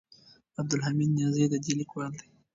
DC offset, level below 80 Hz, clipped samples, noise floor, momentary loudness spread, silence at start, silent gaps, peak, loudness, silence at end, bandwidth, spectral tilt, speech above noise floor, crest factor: under 0.1%; -68 dBFS; under 0.1%; -59 dBFS; 13 LU; 0.6 s; none; -12 dBFS; -29 LUFS; 0.35 s; 7.8 kHz; -6 dB/octave; 30 dB; 18 dB